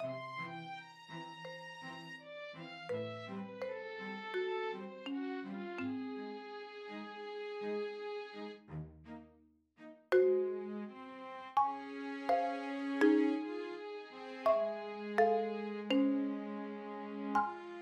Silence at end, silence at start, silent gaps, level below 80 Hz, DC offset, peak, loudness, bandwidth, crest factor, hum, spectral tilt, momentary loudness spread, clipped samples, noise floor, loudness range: 0 s; 0 s; none; -76 dBFS; under 0.1%; -18 dBFS; -38 LUFS; 11 kHz; 20 dB; none; -6.5 dB/octave; 16 LU; under 0.1%; -68 dBFS; 10 LU